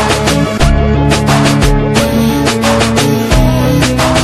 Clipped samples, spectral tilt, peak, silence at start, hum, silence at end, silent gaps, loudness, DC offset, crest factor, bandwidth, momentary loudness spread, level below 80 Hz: under 0.1%; -5 dB/octave; 0 dBFS; 0 s; none; 0 s; none; -10 LUFS; under 0.1%; 10 dB; 15 kHz; 2 LU; -18 dBFS